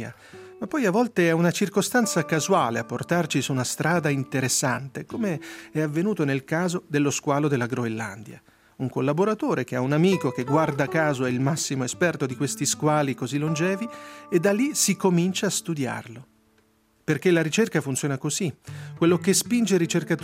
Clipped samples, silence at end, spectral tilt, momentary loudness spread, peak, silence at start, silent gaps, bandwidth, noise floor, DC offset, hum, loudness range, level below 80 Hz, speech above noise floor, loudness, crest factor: under 0.1%; 0 s; -4.5 dB/octave; 9 LU; -6 dBFS; 0 s; none; 16 kHz; -63 dBFS; under 0.1%; none; 3 LU; -68 dBFS; 39 dB; -24 LUFS; 18 dB